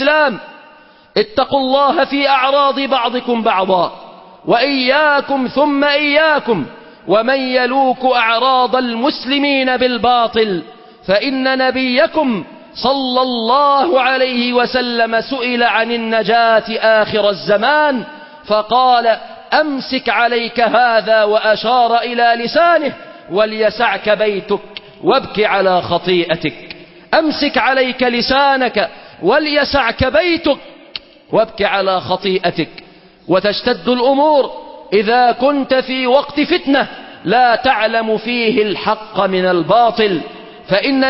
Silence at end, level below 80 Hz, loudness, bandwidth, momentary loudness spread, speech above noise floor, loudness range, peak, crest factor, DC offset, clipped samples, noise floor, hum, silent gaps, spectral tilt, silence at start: 0 s; -46 dBFS; -14 LUFS; 5.8 kHz; 8 LU; 30 dB; 2 LU; 0 dBFS; 14 dB; under 0.1%; under 0.1%; -44 dBFS; none; none; -8.5 dB/octave; 0 s